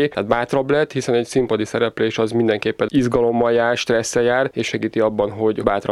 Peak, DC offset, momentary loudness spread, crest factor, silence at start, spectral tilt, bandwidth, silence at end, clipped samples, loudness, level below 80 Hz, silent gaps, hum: -2 dBFS; under 0.1%; 3 LU; 16 dB; 0 s; -5 dB/octave; 12.5 kHz; 0 s; under 0.1%; -19 LUFS; -48 dBFS; none; none